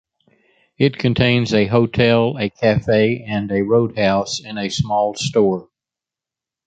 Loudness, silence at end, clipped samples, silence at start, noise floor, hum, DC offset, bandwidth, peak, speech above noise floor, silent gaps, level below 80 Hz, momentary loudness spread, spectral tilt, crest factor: -17 LUFS; 1.05 s; under 0.1%; 0.8 s; -87 dBFS; none; under 0.1%; 9.2 kHz; -2 dBFS; 71 dB; none; -46 dBFS; 7 LU; -6 dB/octave; 16 dB